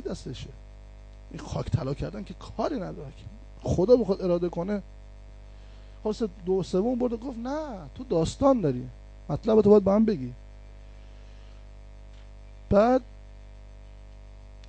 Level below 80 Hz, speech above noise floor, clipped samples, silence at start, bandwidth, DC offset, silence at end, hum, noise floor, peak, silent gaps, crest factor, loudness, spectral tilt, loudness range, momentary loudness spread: -44 dBFS; 20 dB; under 0.1%; 0 s; 9 kHz; under 0.1%; 0 s; 50 Hz at -45 dBFS; -46 dBFS; -8 dBFS; none; 20 dB; -26 LUFS; -7.5 dB/octave; 7 LU; 20 LU